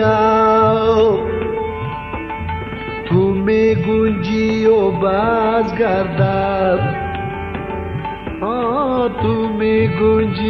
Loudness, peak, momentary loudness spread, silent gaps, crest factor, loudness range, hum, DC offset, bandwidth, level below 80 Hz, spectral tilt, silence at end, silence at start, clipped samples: -17 LUFS; -2 dBFS; 11 LU; none; 14 dB; 4 LU; none; under 0.1%; 6.2 kHz; -36 dBFS; -8 dB/octave; 0 s; 0 s; under 0.1%